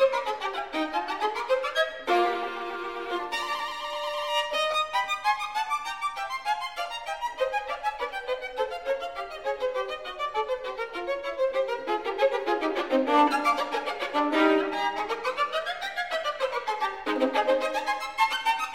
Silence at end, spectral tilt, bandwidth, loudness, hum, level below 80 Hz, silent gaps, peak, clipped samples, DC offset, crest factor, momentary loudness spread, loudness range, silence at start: 0 s; -2 dB/octave; 16 kHz; -28 LUFS; none; -62 dBFS; none; -10 dBFS; under 0.1%; 0.2%; 18 dB; 8 LU; 6 LU; 0 s